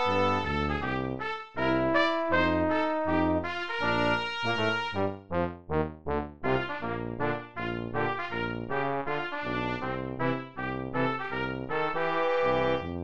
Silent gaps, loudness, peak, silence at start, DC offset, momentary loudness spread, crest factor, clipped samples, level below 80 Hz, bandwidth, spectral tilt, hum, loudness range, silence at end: none; -29 LUFS; -12 dBFS; 0 s; 0.6%; 8 LU; 18 dB; under 0.1%; -48 dBFS; 8.4 kHz; -6.5 dB/octave; none; 5 LU; 0 s